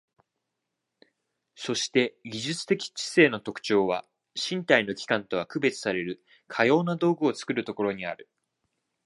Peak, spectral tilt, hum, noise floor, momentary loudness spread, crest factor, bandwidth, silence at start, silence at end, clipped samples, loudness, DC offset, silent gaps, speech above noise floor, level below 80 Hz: -2 dBFS; -4.5 dB/octave; none; -83 dBFS; 12 LU; 26 dB; 11.5 kHz; 1.6 s; 0.9 s; under 0.1%; -27 LUFS; under 0.1%; none; 57 dB; -70 dBFS